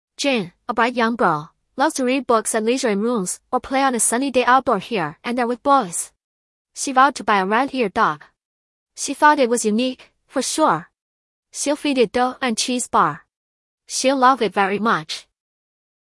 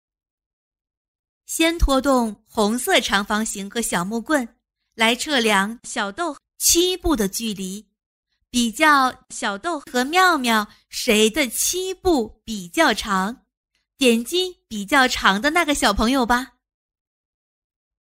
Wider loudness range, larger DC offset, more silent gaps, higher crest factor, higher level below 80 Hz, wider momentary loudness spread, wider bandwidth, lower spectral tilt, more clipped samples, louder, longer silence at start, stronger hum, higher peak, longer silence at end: about the same, 2 LU vs 2 LU; neither; first, 6.24-6.65 s, 8.45-8.86 s, 11.01-11.43 s, 13.37-13.78 s vs 8.06-8.23 s, 13.57-13.64 s; about the same, 18 dB vs 20 dB; second, -60 dBFS vs -38 dBFS; about the same, 11 LU vs 11 LU; second, 12 kHz vs 16 kHz; about the same, -3 dB/octave vs -2.5 dB/octave; neither; about the same, -19 LUFS vs -20 LUFS; second, 0.2 s vs 1.5 s; neither; about the same, -2 dBFS vs -2 dBFS; second, 0.9 s vs 1.65 s